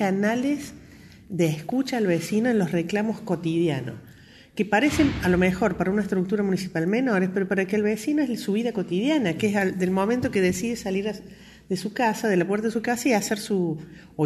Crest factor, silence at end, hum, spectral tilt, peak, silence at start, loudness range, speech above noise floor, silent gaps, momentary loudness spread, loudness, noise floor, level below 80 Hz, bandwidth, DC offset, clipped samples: 16 dB; 0 s; none; -6 dB/octave; -8 dBFS; 0 s; 2 LU; 26 dB; none; 8 LU; -24 LUFS; -49 dBFS; -50 dBFS; 13 kHz; under 0.1%; under 0.1%